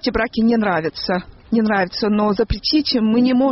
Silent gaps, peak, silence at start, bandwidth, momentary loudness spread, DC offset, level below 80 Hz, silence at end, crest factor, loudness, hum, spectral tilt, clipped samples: none; -6 dBFS; 0.05 s; 6 kHz; 6 LU; under 0.1%; -36 dBFS; 0 s; 12 dB; -18 LUFS; none; -4 dB/octave; under 0.1%